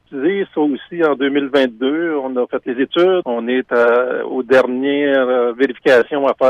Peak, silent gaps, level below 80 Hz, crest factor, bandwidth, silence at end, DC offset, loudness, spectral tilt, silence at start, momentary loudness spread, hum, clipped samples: -4 dBFS; none; -64 dBFS; 12 dB; 9.4 kHz; 0 s; under 0.1%; -16 LUFS; -6 dB/octave; 0.1 s; 6 LU; none; under 0.1%